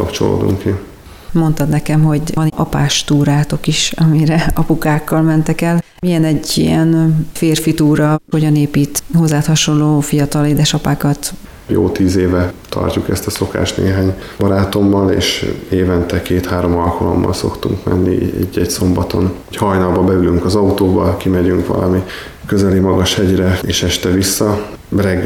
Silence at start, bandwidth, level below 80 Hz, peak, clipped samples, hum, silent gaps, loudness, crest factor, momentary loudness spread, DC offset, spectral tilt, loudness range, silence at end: 0 s; 17 kHz; -32 dBFS; -2 dBFS; under 0.1%; none; none; -14 LUFS; 10 dB; 6 LU; under 0.1%; -5.5 dB/octave; 2 LU; 0 s